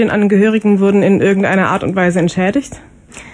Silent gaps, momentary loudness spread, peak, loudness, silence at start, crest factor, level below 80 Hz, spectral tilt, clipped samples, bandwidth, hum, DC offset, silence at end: none; 5 LU; -2 dBFS; -12 LUFS; 0 s; 12 dB; -46 dBFS; -7 dB/octave; under 0.1%; 10.5 kHz; none; under 0.1%; 0.05 s